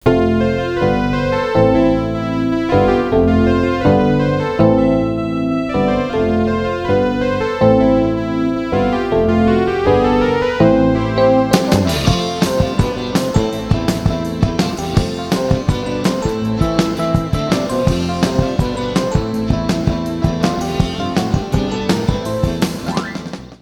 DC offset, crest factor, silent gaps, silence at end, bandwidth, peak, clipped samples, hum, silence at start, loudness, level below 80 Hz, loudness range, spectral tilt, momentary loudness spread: under 0.1%; 16 dB; none; 0.05 s; 18 kHz; 0 dBFS; under 0.1%; none; 0.05 s; -16 LUFS; -30 dBFS; 4 LU; -6.5 dB/octave; 6 LU